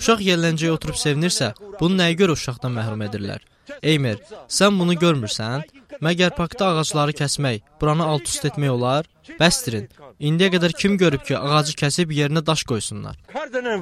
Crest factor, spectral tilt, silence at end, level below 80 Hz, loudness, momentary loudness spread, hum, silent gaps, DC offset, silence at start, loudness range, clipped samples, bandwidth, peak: 20 dB; -4.5 dB/octave; 0 s; -48 dBFS; -20 LUFS; 11 LU; none; none; under 0.1%; 0 s; 2 LU; under 0.1%; 15 kHz; 0 dBFS